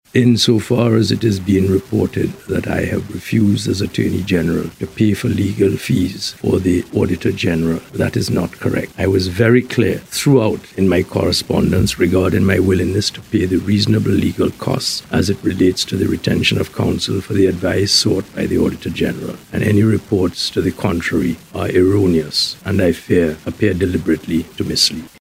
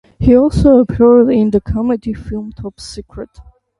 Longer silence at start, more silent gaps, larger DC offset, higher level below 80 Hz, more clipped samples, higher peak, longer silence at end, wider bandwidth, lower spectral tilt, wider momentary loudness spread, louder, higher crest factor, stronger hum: about the same, 0.15 s vs 0.2 s; neither; neither; second, -44 dBFS vs -28 dBFS; neither; about the same, 0 dBFS vs 0 dBFS; second, 0.15 s vs 0.4 s; first, 16 kHz vs 11.5 kHz; second, -5.5 dB/octave vs -8.5 dB/octave; second, 6 LU vs 20 LU; second, -16 LUFS vs -11 LUFS; about the same, 16 dB vs 12 dB; neither